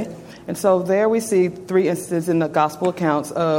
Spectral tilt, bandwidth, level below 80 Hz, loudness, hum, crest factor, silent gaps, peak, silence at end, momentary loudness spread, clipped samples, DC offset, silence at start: -6 dB/octave; 17 kHz; -60 dBFS; -20 LUFS; none; 16 dB; none; -4 dBFS; 0 s; 5 LU; under 0.1%; under 0.1%; 0 s